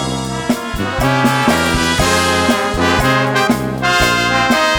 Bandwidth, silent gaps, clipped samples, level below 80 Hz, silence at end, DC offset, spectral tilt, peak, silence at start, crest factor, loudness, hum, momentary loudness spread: over 20 kHz; none; under 0.1%; -30 dBFS; 0 s; under 0.1%; -4 dB/octave; 0 dBFS; 0 s; 14 dB; -14 LUFS; none; 6 LU